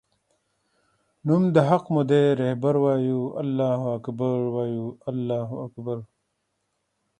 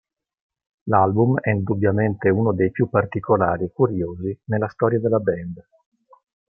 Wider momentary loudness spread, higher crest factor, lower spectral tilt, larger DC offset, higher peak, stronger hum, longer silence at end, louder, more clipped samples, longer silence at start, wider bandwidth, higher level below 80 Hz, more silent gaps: first, 13 LU vs 9 LU; about the same, 20 dB vs 18 dB; second, -9 dB/octave vs -12.5 dB/octave; neither; about the same, -4 dBFS vs -2 dBFS; neither; first, 1.15 s vs 0.9 s; second, -24 LUFS vs -21 LUFS; neither; first, 1.25 s vs 0.85 s; first, 9.4 kHz vs 3 kHz; second, -66 dBFS vs -56 dBFS; neither